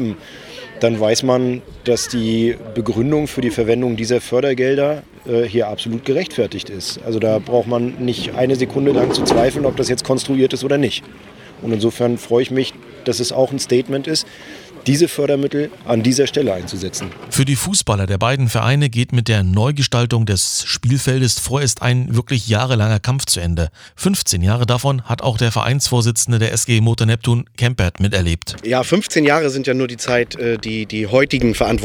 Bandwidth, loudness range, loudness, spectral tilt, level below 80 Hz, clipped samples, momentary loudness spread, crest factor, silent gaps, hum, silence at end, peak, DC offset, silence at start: over 20 kHz; 3 LU; -17 LUFS; -5 dB/octave; -40 dBFS; under 0.1%; 7 LU; 16 dB; none; none; 0 s; 0 dBFS; under 0.1%; 0 s